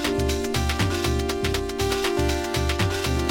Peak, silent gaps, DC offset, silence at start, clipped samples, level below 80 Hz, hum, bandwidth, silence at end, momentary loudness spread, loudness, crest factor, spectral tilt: -8 dBFS; none; under 0.1%; 0 s; under 0.1%; -30 dBFS; none; 17 kHz; 0 s; 2 LU; -24 LUFS; 16 dB; -4.5 dB/octave